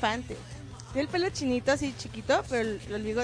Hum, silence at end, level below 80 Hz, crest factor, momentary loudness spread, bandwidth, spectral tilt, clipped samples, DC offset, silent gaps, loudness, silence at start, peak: none; 0 s; -50 dBFS; 18 dB; 14 LU; 10.5 kHz; -4.5 dB/octave; under 0.1%; under 0.1%; none; -30 LUFS; 0 s; -12 dBFS